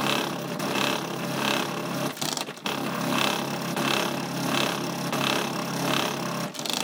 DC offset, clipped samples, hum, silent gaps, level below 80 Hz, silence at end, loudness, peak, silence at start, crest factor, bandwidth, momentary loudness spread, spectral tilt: under 0.1%; under 0.1%; none; none; -70 dBFS; 0 s; -27 LUFS; -6 dBFS; 0 s; 20 dB; 19 kHz; 5 LU; -3.5 dB/octave